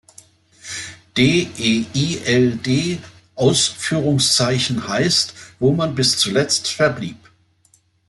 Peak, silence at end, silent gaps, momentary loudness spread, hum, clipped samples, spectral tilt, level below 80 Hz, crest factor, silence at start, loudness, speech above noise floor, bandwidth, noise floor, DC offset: -2 dBFS; 0.9 s; none; 14 LU; none; under 0.1%; -4 dB/octave; -54 dBFS; 16 dB; 0.65 s; -17 LUFS; 40 dB; 12 kHz; -58 dBFS; under 0.1%